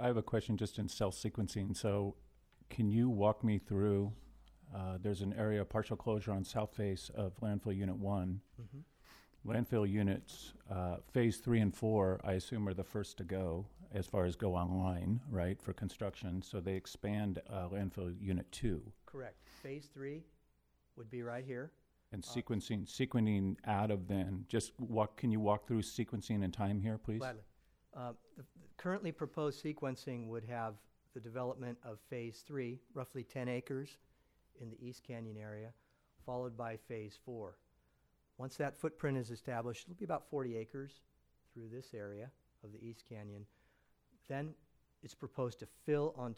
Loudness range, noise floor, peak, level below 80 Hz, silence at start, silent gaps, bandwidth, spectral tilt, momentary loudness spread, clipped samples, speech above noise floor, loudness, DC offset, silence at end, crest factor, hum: 11 LU; -76 dBFS; -20 dBFS; -62 dBFS; 0 s; none; 15 kHz; -7 dB/octave; 17 LU; under 0.1%; 37 dB; -40 LUFS; under 0.1%; 0 s; 20 dB; none